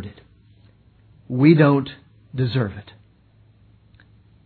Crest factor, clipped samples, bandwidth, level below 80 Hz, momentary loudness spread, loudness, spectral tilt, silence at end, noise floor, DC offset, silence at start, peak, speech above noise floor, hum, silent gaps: 20 dB; under 0.1%; 4.6 kHz; -58 dBFS; 22 LU; -19 LUFS; -11.5 dB/octave; 1.65 s; -55 dBFS; under 0.1%; 0 s; -2 dBFS; 37 dB; none; none